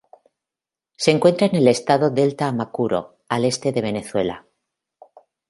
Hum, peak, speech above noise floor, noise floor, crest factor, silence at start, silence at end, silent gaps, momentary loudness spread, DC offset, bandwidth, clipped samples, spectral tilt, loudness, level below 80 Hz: none; 0 dBFS; 70 dB; -88 dBFS; 20 dB; 1 s; 1.1 s; none; 9 LU; under 0.1%; 11.5 kHz; under 0.1%; -5.5 dB/octave; -20 LUFS; -60 dBFS